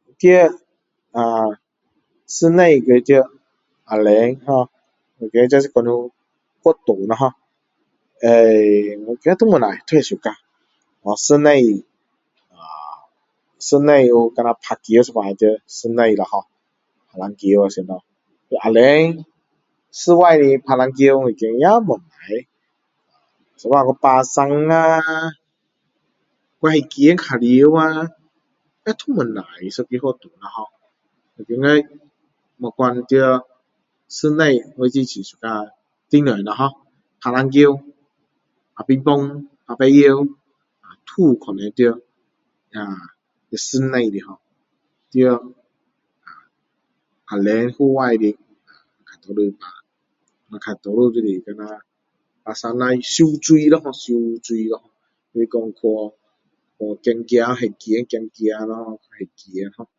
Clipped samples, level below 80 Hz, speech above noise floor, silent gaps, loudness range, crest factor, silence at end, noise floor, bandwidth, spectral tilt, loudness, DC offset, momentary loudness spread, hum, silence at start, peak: under 0.1%; -66 dBFS; 57 dB; none; 7 LU; 18 dB; 0.15 s; -72 dBFS; 8 kHz; -5.5 dB/octave; -16 LUFS; under 0.1%; 19 LU; none; 0.25 s; 0 dBFS